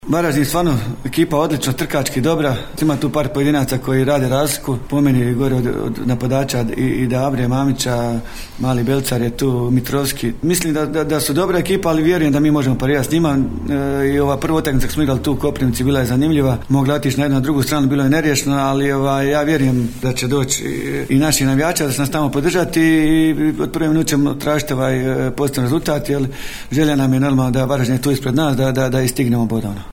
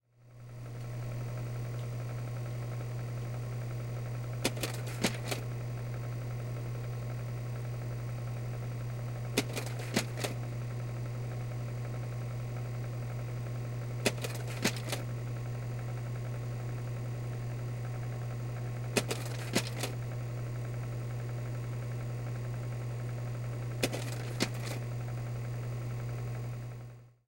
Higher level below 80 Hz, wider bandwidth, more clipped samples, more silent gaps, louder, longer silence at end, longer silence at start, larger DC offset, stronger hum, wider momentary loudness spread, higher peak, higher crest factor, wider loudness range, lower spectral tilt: first, -34 dBFS vs -56 dBFS; about the same, 17.5 kHz vs 16.5 kHz; neither; neither; first, -17 LUFS vs -37 LUFS; second, 0 s vs 0.15 s; second, 0.05 s vs 0.2 s; neither; neither; about the same, 5 LU vs 5 LU; first, -2 dBFS vs -12 dBFS; second, 14 dB vs 24 dB; about the same, 2 LU vs 2 LU; about the same, -5.5 dB/octave vs -5 dB/octave